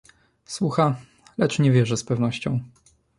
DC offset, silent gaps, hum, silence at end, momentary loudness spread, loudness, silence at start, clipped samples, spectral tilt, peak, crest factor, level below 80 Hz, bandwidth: under 0.1%; none; none; 0.5 s; 14 LU; -23 LUFS; 0.5 s; under 0.1%; -6.5 dB/octave; -6 dBFS; 18 dB; -58 dBFS; 11.5 kHz